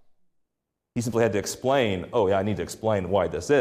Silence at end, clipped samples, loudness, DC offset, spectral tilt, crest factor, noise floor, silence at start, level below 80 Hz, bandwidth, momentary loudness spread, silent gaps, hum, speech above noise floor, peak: 0 s; under 0.1%; -25 LUFS; under 0.1%; -5.5 dB/octave; 14 dB; -82 dBFS; 0.95 s; -58 dBFS; 15.5 kHz; 6 LU; none; none; 58 dB; -10 dBFS